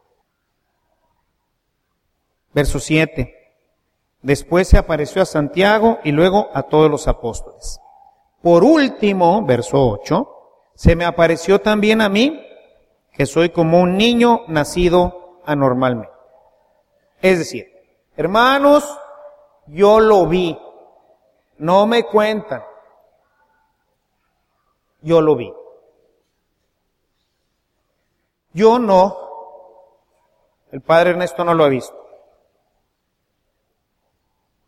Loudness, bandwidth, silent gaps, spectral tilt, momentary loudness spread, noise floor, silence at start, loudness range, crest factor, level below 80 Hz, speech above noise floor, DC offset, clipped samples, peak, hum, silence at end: -15 LUFS; 15.5 kHz; none; -6 dB/octave; 18 LU; -71 dBFS; 2.55 s; 7 LU; 18 dB; -30 dBFS; 56 dB; under 0.1%; under 0.1%; 0 dBFS; none; 2.65 s